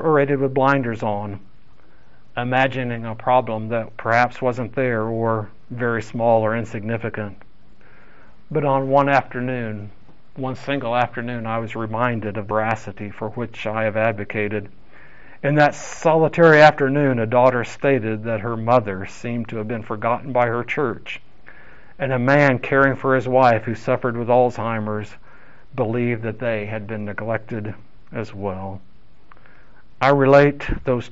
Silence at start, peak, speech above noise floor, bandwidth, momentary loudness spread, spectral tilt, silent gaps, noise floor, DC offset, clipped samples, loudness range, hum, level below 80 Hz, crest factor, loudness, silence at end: 0 s; 0 dBFS; 34 dB; 8 kHz; 14 LU; -5.5 dB/octave; none; -53 dBFS; 2%; under 0.1%; 8 LU; none; -46 dBFS; 20 dB; -20 LUFS; 0.05 s